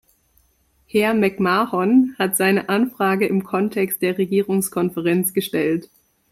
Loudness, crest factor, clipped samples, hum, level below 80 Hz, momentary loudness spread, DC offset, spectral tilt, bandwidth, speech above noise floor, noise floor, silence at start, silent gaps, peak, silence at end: -19 LUFS; 16 dB; under 0.1%; none; -62 dBFS; 5 LU; under 0.1%; -5 dB/octave; 16 kHz; 42 dB; -61 dBFS; 0.95 s; none; -4 dBFS; 0.45 s